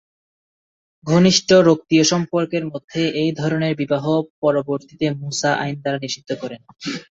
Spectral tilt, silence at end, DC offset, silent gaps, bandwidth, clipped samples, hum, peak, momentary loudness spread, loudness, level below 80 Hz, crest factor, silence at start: -5 dB/octave; 0.1 s; under 0.1%; 2.84-2.88 s, 4.30-4.42 s; 8 kHz; under 0.1%; none; -2 dBFS; 15 LU; -19 LUFS; -58 dBFS; 18 dB; 1.05 s